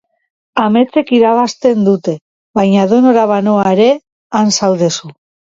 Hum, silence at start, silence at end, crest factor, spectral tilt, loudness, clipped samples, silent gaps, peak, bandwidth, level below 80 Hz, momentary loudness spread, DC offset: none; 0.55 s; 0.45 s; 12 dB; -5.5 dB/octave; -12 LUFS; under 0.1%; 2.21-2.54 s, 4.12-4.30 s; 0 dBFS; 7.8 kHz; -56 dBFS; 10 LU; under 0.1%